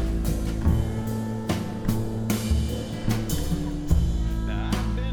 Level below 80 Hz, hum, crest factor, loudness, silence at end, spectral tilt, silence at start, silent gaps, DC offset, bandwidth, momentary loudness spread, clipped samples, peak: -28 dBFS; none; 16 dB; -27 LUFS; 0 s; -6.5 dB/octave; 0 s; none; under 0.1%; 19.5 kHz; 4 LU; under 0.1%; -8 dBFS